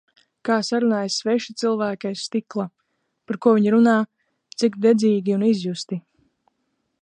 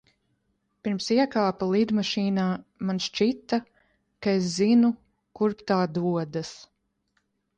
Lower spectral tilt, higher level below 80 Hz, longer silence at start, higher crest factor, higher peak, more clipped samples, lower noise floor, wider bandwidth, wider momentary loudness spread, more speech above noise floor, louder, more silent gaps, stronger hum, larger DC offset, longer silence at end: about the same, -5.5 dB/octave vs -6 dB/octave; second, -72 dBFS vs -66 dBFS; second, 0.45 s vs 0.85 s; about the same, 18 dB vs 16 dB; first, -4 dBFS vs -10 dBFS; neither; about the same, -73 dBFS vs -74 dBFS; about the same, 9.6 kHz vs 9.2 kHz; first, 15 LU vs 10 LU; first, 53 dB vs 49 dB; first, -21 LUFS vs -26 LUFS; neither; neither; neither; about the same, 1 s vs 0.95 s